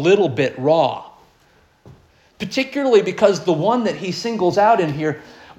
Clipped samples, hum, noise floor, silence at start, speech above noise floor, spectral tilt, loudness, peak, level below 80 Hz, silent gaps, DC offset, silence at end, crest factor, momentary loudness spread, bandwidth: under 0.1%; none; -55 dBFS; 0 s; 38 dB; -5.5 dB/octave; -18 LUFS; -2 dBFS; -58 dBFS; none; under 0.1%; 0.25 s; 18 dB; 9 LU; 12.5 kHz